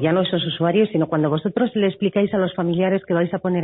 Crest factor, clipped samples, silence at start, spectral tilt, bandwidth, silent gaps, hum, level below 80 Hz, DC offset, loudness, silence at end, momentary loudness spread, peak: 12 dB; under 0.1%; 0 s; -12 dB/octave; 4.1 kHz; none; none; -58 dBFS; under 0.1%; -20 LUFS; 0 s; 3 LU; -6 dBFS